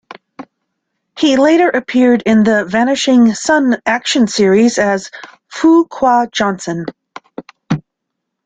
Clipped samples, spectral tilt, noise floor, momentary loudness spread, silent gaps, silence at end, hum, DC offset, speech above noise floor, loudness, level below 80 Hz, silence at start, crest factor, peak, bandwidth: under 0.1%; -4.5 dB/octave; -75 dBFS; 20 LU; none; 0.65 s; none; under 0.1%; 64 dB; -12 LUFS; -54 dBFS; 0.4 s; 12 dB; -2 dBFS; 9.4 kHz